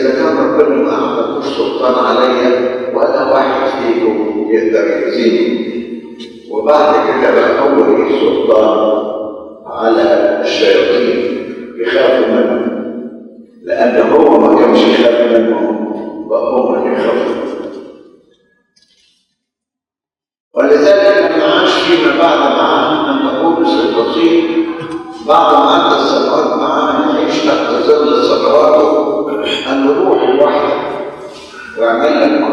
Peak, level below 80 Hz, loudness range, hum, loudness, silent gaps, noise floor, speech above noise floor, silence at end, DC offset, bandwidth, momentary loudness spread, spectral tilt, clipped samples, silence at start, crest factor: 0 dBFS; -54 dBFS; 4 LU; none; -11 LUFS; 20.40-20.51 s; -90 dBFS; 80 dB; 0 s; under 0.1%; 9.8 kHz; 13 LU; -5 dB/octave; 0.1%; 0 s; 12 dB